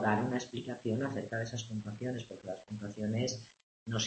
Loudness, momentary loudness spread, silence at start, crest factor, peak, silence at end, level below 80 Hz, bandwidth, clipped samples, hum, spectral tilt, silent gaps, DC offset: -37 LUFS; 10 LU; 0 s; 20 dB; -16 dBFS; 0 s; -70 dBFS; 8.4 kHz; under 0.1%; none; -5 dB/octave; 3.63-3.86 s; under 0.1%